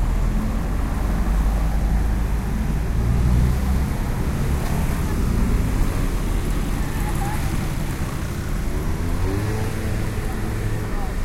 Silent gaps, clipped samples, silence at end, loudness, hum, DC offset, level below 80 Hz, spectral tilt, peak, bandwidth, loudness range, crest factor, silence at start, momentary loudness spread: none; under 0.1%; 0 s; -24 LUFS; none; under 0.1%; -22 dBFS; -6.5 dB/octave; -6 dBFS; 16 kHz; 3 LU; 14 dB; 0 s; 5 LU